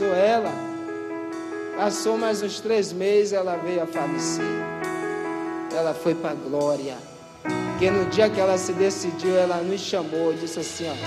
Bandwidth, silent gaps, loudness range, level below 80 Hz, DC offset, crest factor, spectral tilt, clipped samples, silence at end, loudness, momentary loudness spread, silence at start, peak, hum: 14 kHz; none; 4 LU; -62 dBFS; under 0.1%; 18 dB; -4.5 dB/octave; under 0.1%; 0 s; -24 LUFS; 11 LU; 0 s; -6 dBFS; none